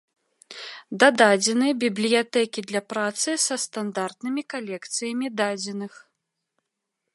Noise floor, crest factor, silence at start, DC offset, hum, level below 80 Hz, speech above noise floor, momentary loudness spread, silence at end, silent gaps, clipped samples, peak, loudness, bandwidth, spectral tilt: -81 dBFS; 24 dB; 0.5 s; under 0.1%; none; -80 dBFS; 58 dB; 17 LU; 1.15 s; none; under 0.1%; -2 dBFS; -23 LUFS; 11.5 kHz; -2.5 dB/octave